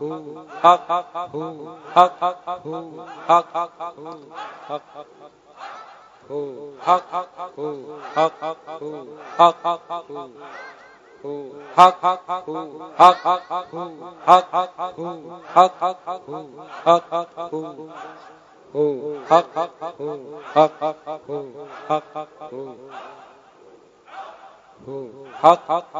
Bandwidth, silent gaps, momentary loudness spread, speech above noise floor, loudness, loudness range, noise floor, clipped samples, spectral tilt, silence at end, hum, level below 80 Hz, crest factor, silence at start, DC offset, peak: 10 kHz; none; 22 LU; 28 dB; -20 LUFS; 12 LU; -49 dBFS; under 0.1%; -5 dB/octave; 0 s; none; -72 dBFS; 22 dB; 0 s; under 0.1%; 0 dBFS